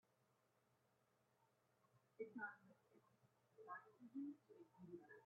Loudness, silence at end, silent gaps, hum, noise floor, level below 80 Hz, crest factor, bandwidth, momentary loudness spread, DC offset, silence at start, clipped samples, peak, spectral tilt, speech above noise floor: -58 LUFS; 0 s; none; none; -83 dBFS; under -90 dBFS; 22 dB; 4.6 kHz; 14 LU; under 0.1%; 1.4 s; under 0.1%; -40 dBFS; -6 dB/octave; 26 dB